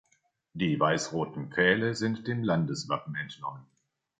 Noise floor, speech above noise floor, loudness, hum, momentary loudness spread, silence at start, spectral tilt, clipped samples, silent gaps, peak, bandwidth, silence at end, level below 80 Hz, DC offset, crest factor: -72 dBFS; 43 dB; -29 LUFS; none; 13 LU; 0.55 s; -5.5 dB/octave; under 0.1%; none; -8 dBFS; 9.2 kHz; 0.6 s; -64 dBFS; under 0.1%; 22 dB